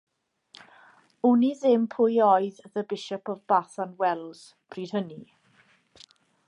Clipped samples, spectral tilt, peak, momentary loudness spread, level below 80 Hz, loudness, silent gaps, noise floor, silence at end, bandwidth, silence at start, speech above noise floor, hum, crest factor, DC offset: under 0.1%; -6.5 dB/octave; -8 dBFS; 17 LU; -80 dBFS; -25 LUFS; none; -63 dBFS; 1.25 s; 10.5 kHz; 1.25 s; 37 dB; none; 18 dB; under 0.1%